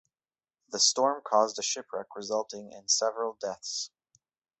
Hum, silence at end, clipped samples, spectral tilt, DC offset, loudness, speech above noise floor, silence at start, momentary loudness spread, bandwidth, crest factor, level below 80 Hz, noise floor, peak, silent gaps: none; 0.75 s; under 0.1%; -0.5 dB/octave; under 0.1%; -29 LUFS; over 60 dB; 0.7 s; 15 LU; 8.4 kHz; 22 dB; -80 dBFS; under -90 dBFS; -8 dBFS; none